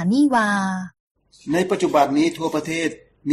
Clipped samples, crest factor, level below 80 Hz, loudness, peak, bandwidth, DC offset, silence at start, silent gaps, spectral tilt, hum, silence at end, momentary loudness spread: under 0.1%; 16 dB; -60 dBFS; -20 LUFS; -4 dBFS; 14 kHz; under 0.1%; 0 s; 1.00-1.15 s; -5.5 dB/octave; none; 0 s; 14 LU